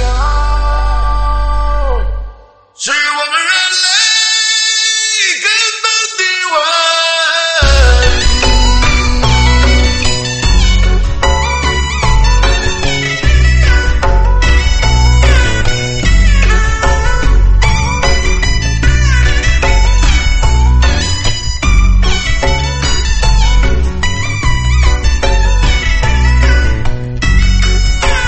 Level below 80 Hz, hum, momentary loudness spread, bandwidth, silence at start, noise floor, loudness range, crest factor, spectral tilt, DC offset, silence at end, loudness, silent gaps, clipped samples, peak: -12 dBFS; none; 6 LU; 8.8 kHz; 0 s; -38 dBFS; 4 LU; 10 dB; -3.5 dB/octave; under 0.1%; 0 s; -11 LUFS; none; 0.1%; 0 dBFS